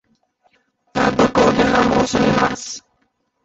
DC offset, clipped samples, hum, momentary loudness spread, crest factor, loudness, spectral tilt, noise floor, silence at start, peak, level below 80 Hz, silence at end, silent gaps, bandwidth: under 0.1%; under 0.1%; none; 14 LU; 16 dB; -16 LUFS; -5 dB/octave; -66 dBFS; 0.95 s; -2 dBFS; -42 dBFS; 0.65 s; none; 8.2 kHz